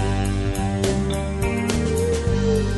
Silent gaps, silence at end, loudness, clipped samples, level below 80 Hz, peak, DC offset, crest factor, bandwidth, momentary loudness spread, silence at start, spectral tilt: none; 0 s; -22 LUFS; under 0.1%; -28 dBFS; -2 dBFS; under 0.1%; 18 dB; 12 kHz; 3 LU; 0 s; -6 dB/octave